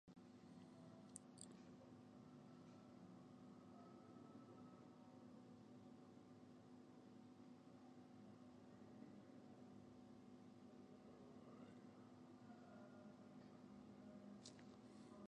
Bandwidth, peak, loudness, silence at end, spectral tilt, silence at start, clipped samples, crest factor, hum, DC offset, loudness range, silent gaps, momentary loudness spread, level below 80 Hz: 9.4 kHz; -36 dBFS; -64 LUFS; 0.05 s; -5.5 dB/octave; 0.05 s; under 0.1%; 28 dB; none; under 0.1%; 2 LU; none; 4 LU; -88 dBFS